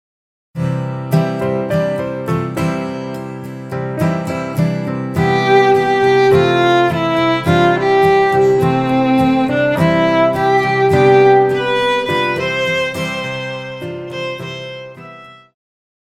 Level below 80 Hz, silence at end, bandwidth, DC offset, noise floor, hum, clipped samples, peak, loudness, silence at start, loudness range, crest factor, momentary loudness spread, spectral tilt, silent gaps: -48 dBFS; 0.7 s; 15 kHz; under 0.1%; -37 dBFS; none; under 0.1%; 0 dBFS; -14 LUFS; 0.55 s; 8 LU; 14 dB; 14 LU; -6.5 dB/octave; none